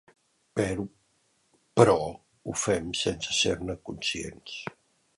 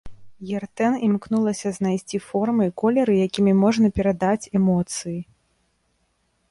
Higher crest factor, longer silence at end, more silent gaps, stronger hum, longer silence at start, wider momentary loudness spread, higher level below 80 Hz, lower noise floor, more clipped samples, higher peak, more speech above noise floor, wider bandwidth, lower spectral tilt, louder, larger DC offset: first, 26 dB vs 16 dB; second, 0.45 s vs 1.3 s; neither; neither; first, 0.55 s vs 0.05 s; first, 17 LU vs 12 LU; about the same, -54 dBFS vs -50 dBFS; about the same, -70 dBFS vs -68 dBFS; neither; about the same, -4 dBFS vs -6 dBFS; second, 42 dB vs 48 dB; about the same, 11.5 kHz vs 11.5 kHz; second, -4 dB/octave vs -6.5 dB/octave; second, -28 LUFS vs -22 LUFS; neither